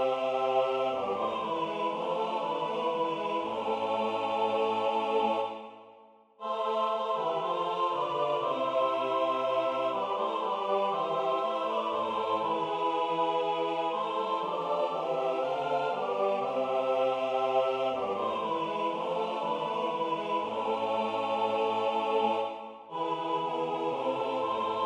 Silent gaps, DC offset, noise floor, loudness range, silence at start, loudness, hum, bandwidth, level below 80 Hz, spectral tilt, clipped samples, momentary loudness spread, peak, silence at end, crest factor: none; under 0.1%; -57 dBFS; 2 LU; 0 s; -30 LUFS; none; 10 kHz; -78 dBFS; -5 dB/octave; under 0.1%; 3 LU; -16 dBFS; 0 s; 14 dB